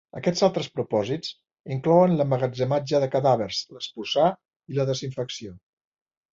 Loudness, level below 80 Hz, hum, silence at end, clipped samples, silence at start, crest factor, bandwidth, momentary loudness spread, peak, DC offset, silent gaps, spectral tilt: -24 LUFS; -62 dBFS; none; 0.75 s; under 0.1%; 0.15 s; 18 dB; 7.6 kHz; 14 LU; -6 dBFS; under 0.1%; 1.60-1.64 s, 4.56-4.60 s; -6 dB/octave